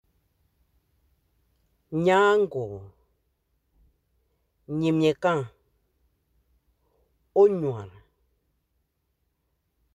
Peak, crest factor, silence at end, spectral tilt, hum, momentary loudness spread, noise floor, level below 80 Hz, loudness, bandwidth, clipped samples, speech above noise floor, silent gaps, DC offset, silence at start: -8 dBFS; 20 dB; 2.05 s; -7 dB/octave; none; 17 LU; -75 dBFS; -64 dBFS; -24 LUFS; 9.8 kHz; under 0.1%; 53 dB; none; under 0.1%; 1.9 s